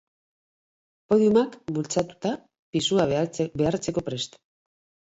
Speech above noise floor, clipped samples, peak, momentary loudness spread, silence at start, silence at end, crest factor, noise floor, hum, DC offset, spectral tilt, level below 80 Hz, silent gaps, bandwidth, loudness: over 66 dB; under 0.1%; -8 dBFS; 11 LU; 1.1 s; 0.75 s; 18 dB; under -90 dBFS; none; under 0.1%; -5.5 dB/octave; -58 dBFS; 2.59-2.73 s; 8.2 kHz; -25 LUFS